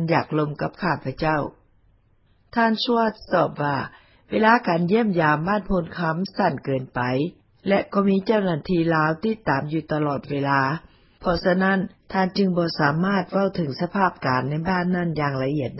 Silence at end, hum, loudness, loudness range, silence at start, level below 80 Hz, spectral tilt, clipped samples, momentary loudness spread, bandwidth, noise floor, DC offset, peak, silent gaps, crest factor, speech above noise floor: 0 s; none; -23 LUFS; 3 LU; 0 s; -50 dBFS; -10.5 dB/octave; under 0.1%; 7 LU; 5.8 kHz; -60 dBFS; under 0.1%; -4 dBFS; none; 18 dB; 38 dB